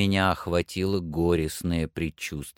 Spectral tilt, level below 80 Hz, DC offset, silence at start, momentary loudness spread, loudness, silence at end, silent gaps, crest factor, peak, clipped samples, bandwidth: -5.5 dB/octave; -44 dBFS; under 0.1%; 0 s; 7 LU; -27 LUFS; 0.05 s; none; 18 dB; -8 dBFS; under 0.1%; 17 kHz